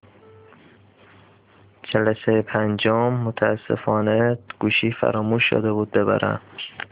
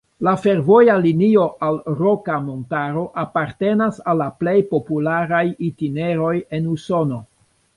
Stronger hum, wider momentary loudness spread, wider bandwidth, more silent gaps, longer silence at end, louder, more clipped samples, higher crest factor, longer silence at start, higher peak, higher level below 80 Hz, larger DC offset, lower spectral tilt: neither; second, 6 LU vs 10 LU; second, 4 kHz vs 11.5 kHz; neither; second, 0.05 s vs 0.5 s; about the same, -21 LUFS vs -19 LUFS; neither; about the same, 20 dB vs 16 dB; first, 1.85 s vs 0.2 s; about the same, -4 dBFS vs -2 dBFS; about the same, -56 dBFS vs -56 dBFS; neither; first, -10.5 dB/octave vs -8.5 dB/octave